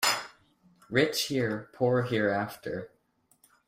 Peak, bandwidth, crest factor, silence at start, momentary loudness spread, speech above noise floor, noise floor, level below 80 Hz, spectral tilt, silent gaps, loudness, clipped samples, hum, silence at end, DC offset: -10 dBFS; 16 kHz; 20 dB; 0 s; 12 LU; 38 dB; -67 dBFS; -68 dBFS; -4 dB/octave; none; -29 LUFS; under 0.1%; none; 0.8 s; under 0.1%